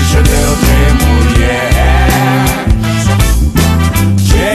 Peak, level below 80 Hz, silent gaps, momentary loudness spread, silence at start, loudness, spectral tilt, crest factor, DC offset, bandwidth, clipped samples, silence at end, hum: 0 dBFS; -12 dBFS; none; 2 LU; 0 s; -10 LUFS; -5 dB/octave; 8 dB; under 0.1%; 14 kHz; under 0.1%; 0 s; none